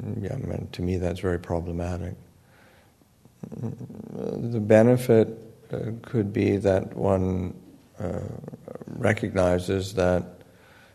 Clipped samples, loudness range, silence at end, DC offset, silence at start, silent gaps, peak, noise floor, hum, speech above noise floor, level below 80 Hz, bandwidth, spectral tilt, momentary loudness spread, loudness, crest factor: under 0.1%; 9 LU; 0.55 s; under 0.1%; 0 s; none; -4 dBFS; -58 dBFS; none; 33 dB; -50 dBFS; 13.5 kHz; -7.5 dB/octave; 19 LU; -25 LUFS; 22 dB